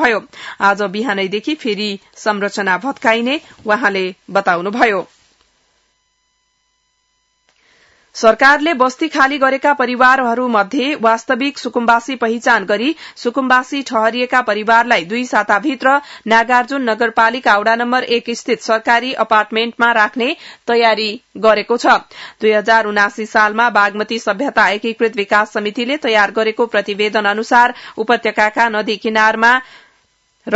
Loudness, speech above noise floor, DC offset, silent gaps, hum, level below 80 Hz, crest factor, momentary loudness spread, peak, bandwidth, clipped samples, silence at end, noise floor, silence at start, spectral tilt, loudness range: -14 LUFS; 49 dB; under 0.1%; none; none; -58 dBFS; 16 dB; 8 LU; 0 dBFS; 8 kHz; under 0.1%; 0 s; -64 dBFS; 0 s; -3.5 dB/octave; 4 LU